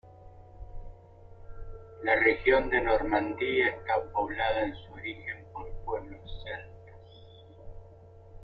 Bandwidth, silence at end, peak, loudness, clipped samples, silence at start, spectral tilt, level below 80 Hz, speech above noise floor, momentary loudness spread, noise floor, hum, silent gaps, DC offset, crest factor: 5.2 kHz; 0 s; -10 dBFS; -29 LUFS; under 0.1%; 0.05 s; -8 dB/octave; -46 dBFS; 24 dB; 25 LU; -52 dBFS; none; none; under 0.1%; 22 dB